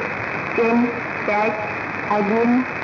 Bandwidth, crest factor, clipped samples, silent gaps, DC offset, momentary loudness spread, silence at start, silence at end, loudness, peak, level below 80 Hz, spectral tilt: 6 kHz; 12 dB; under 0.1%; none; under 0.1%; 7 LU; 0 s; 0 s; -20 LUFS; -8 dBFS; -58 dBFS; -7 dB/octave